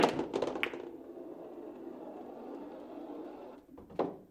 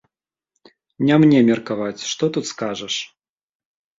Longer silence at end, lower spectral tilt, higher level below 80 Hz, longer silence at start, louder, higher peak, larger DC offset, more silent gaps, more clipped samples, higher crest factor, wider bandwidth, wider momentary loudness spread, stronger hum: second, 0 s vs 0.95 s; about the same, -5 dB/octave vs -5.5 dB/octave; second, -70 dBFS vs -62 dBFS; second, 0 s vs 1 s; second, -41 LUFS vs -19 LUFS; second, -10 dBFS vs -4 dBFS; neither; neither; neither; first, 30 dB vs 18 dB; first, 16 kHz vs 7.8 kHz; about the same, 12 LU vs 13 LU; neither